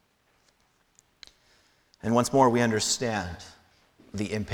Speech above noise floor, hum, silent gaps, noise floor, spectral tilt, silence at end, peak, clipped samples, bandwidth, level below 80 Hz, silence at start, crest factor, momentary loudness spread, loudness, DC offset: 42 dB; none; none; -68 dBFS; -4.5 dB/octave; 0 s; -8 dBFS; under 0.1%; 18.5 kHz; -58 dBFS; 2.05 s; 22 dB; 20 LU; -26 LUFS; under 0.1%